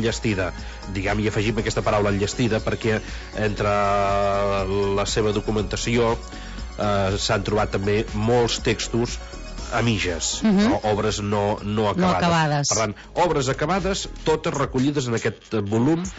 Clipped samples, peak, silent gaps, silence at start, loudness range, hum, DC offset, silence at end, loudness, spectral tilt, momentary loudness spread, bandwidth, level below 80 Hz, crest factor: under 0.1%; -10 dBFS; none; 0 s; 2 LU; none; under 0.1%; 0 s; -22 LUFS; -5 dB/octave; 7 LU; 8 kHz; -36 dBFS; 12 dB